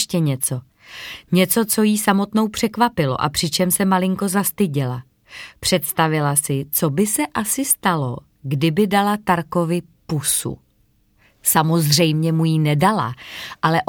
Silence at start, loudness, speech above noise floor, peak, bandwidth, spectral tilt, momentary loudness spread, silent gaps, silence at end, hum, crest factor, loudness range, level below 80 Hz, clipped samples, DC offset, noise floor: 0 s; -19 LUFS; 41 dB; 0 dBFS; 19 kHz; -4.5 dB/octave; 12 LU; none; 0.05 s; none; 18 dB; 2 LU; -52 dBFS; under 0.1%; under 0.1%; -60 dBFS